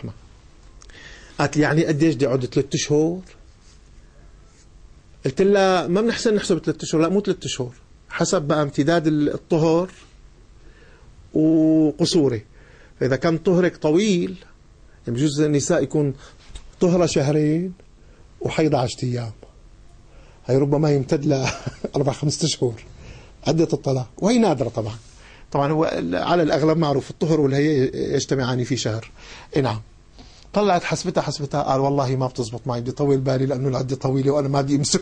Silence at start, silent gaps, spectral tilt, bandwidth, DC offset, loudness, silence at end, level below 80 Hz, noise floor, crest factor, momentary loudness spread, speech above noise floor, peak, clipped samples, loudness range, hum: 0 s; none; -6 dB/octave; 9.8 kHz; under 0.1%; -21 LUFS; 0 s; -48 dBFS; -48 dBFS; 16 dB; 11 LU; 28 dB; -6 dBFS; under 0.1%; 3 LU; none